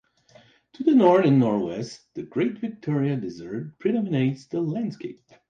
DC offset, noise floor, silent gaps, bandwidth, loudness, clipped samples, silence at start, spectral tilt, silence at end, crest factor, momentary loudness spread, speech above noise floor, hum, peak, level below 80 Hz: under 0.1%; -56 dBFS; none; 7.6 kHz; -24 LUFS; under 0.1%; 0.8 s; -8 dB/octave; 0.35 s; 18 dB; 17 LU; 32 dB; none; -6 dBFS; -66 dBFS